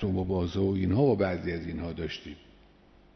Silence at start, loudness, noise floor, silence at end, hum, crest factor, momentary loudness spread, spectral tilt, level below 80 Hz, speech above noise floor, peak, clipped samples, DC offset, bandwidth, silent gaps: 0 s; -29 LUFS; -58 dBFS; 0.8 s; none; 16 dB; 14 LU; -8.5 dB/octave; -50 dBFS; 29 dB; -12 dBFS; under 0.1%; under 0.1%; 6.4 kHz; none